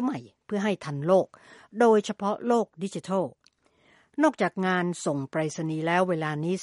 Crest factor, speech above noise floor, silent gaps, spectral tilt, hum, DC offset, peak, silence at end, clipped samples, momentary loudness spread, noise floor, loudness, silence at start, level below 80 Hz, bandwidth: 18 dB; 38 dB; none; -6 dB/octave; none; under 0.1%; -8 dBFS; 0 s; under 0.1%; 11 LU; -64 dBFS; -27 LUFS; 0 s; -74 dBFS; 11.5 kHz